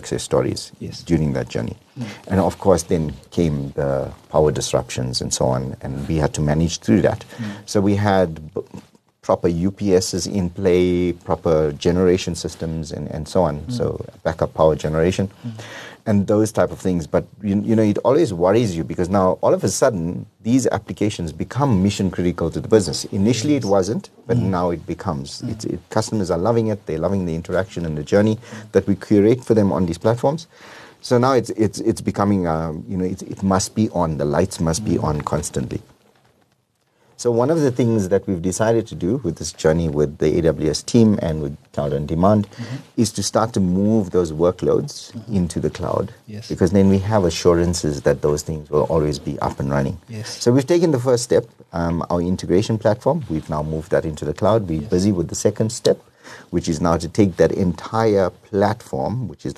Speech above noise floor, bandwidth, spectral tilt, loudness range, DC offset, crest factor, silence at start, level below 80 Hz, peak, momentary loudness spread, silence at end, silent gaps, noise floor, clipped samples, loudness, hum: 45 dB; 13 kHz; -6 dB/octave; 3 LU; under 0.1%; 18 dB; 0 s; -42 dBFS; -2 dBFS; 10 LU; 0.05 s; none; -64 dBFS; under 0.1%; -20 LUFS; none